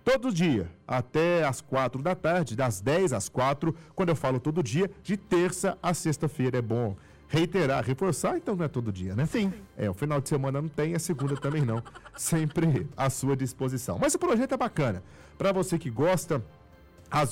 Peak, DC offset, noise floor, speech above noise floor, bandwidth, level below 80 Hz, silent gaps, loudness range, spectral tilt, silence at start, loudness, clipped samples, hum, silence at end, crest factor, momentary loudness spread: -18 dBFS; under 0.1%; -53 dBFS; 26 dB; 16 kHz; -56 dBFS; none; 2 LU; -6 dB/octave; 0.05 s; -28 LUFS; under 0.1%; none; 0 s; 10 dB; 6 LU